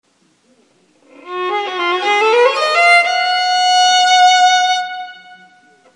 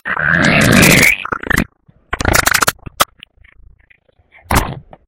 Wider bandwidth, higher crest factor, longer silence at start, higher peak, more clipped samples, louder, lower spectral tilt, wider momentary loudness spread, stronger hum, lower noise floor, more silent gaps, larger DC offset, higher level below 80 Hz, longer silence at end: second, 11 kHz vs over 20 kHz; about the same, 14 dB vs 14 dB; first, 1.25 s vs 0.05 s; about the same, 0 dBFS vs 0 dBFS; second, under 0.1% vs 0.1%; about the same, -12 LUFS vs -12 LUFS; second, 1.5 dB/octave vs -3.5 dB/octave; about the same, 14 LU vs 12 LU; neither; first, -56 dBFS vs -52 dBFS; neither; neither; second, -76 dBFS vs -30 dBFS; first, 0.6 s vs 0.3 s